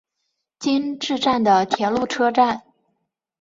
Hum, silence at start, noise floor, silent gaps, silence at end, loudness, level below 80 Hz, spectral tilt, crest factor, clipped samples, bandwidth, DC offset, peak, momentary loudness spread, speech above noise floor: none; 0.6 s; -76 dBFS; none; 0.8 s; -20 LUFS; -60 dBFS; -4.5 dB/octave; 20 dB; under 0.1%; 7.8 kHz; under 0.1%; -2 dBFS; 7 LU; 57 dB